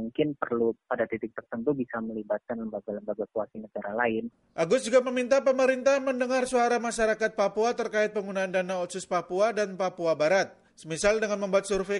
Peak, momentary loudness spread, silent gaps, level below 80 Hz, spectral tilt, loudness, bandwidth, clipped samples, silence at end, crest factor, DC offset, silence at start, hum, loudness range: -10 dBFS; 11 LU; none; -60 dBFS; -4.5 dB/octave; -28 LUFS; 11.5 kHz; under 0.1%; 0 s; 16 dB; under 0.1%; 0 s; none; 7 LU